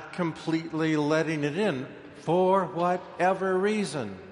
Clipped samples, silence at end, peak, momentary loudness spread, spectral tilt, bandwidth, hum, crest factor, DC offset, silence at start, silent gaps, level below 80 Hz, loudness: under 0.1%; 0 s; -10 dBFS; 8 LU; -6 dB/octave; 11.5 kHz; none; 16 dB; under 0.1%; 0 s; none; -68 dBFS; -27 LUFS